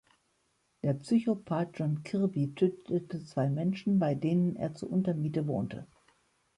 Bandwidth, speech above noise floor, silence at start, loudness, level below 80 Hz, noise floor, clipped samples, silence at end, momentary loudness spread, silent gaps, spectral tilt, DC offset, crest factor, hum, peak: 11 kHz; 44 dB; 0.85 s; -31 LUFS; -68 dBFS; -74 dBFS; under 0.1%; 0.75 s; 6 LU; none; -9 dB/octave; under 0.1%; 16 dB; none; -16 dBFS